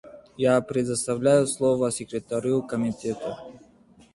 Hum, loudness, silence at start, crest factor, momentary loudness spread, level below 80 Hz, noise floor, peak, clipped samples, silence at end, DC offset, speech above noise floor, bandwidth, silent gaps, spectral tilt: none; -25 LUFS; 0.05 s; 18 dB; 10 LU; -60 dBFS; -55 dBFS; -8 dBFS; under 0.1%; 0.55 s; under 0.1%; 31 dB; 11.5 kHz; none; -5.5 dB/octave